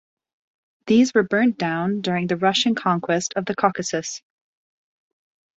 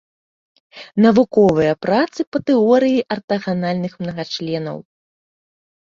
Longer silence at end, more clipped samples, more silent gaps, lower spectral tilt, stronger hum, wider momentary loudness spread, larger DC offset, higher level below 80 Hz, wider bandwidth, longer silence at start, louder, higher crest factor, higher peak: first, 1.4 s vs 1.1 s; neither; second, none vs 2.27-2.32 s, 3.24-3.28 s; second, -4.5 dB/octave vs -7 dB/octave; neither; second, 9 LU vs 12 LU; neither; second, -64 dBFS vs -56 dBFS; about the same, 8 kHz vs 7.4 kHz; about the same, 0.85 s vs 0.75 s; second, -21 LUFS vs -17 LUFS; about the same, 20 dB vs 16 dB; about the same, -2 dBFS vs -2 dBFS